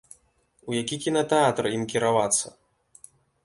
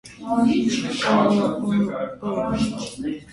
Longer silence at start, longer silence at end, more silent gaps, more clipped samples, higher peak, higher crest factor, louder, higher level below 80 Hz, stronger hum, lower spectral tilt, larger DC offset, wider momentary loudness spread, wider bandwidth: first, 0.65 s vs 0.05 s; first, 0.95 s vs 0 s; neither; neither; about the same, -8 dBFS vs -6 dBFS; about the same, 18 dB vs 16 dB; about the same, -24 LUFS vs -22 LUFS; second, -64 dBFS vs -50 dBFS; neither; second, -3.5 dB/octave vs -5.5 dB/octave; neither; about the same, 9 LU vs 10 LU; about the same, 11.5 kHz vs 11.5 kHz